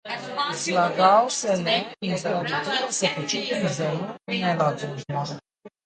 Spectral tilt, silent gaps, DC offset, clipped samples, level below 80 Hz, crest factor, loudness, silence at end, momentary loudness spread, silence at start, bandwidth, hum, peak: -3.5 dB/octave; none; under 0.1%; under 0.1%; -68 dBFS; 20 dB; -24 LUFS; 0.2 s; 11 LU; 0.05 s; 9.6 kHz; none; -6 dBFS